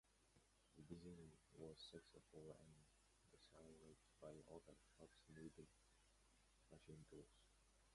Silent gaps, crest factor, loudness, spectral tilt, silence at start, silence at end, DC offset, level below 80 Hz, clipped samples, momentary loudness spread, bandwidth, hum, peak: none; 22 dB; -64 LUFS; -5 dB/octave; 0.05 s; 0 s; under 0.1%; -78 dBFS; under 0.1%; 8 LU; 11.5 kHz; none; -42 dBFS